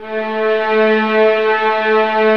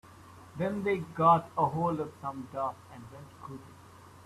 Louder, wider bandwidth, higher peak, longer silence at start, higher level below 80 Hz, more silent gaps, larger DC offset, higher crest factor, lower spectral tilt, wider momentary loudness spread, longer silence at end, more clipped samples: first, -14 LUFS vs -30 LUFS; second, 6.2 kHz vs 13.5 kHz; first, -2 dBFS vs -10 dBFS; about the same, 0 s vs 0.05 s; about the same, -64 dBFS vs -68 dBFS; neither; first, 0.9% vs under 0.1%; second, 12 dB vs 22 dB; second, -6 dB/octave vs -7.5 dB/octave; second, 4 LU vs 24 LU; about the same, 0 s vs 0.05 s; neither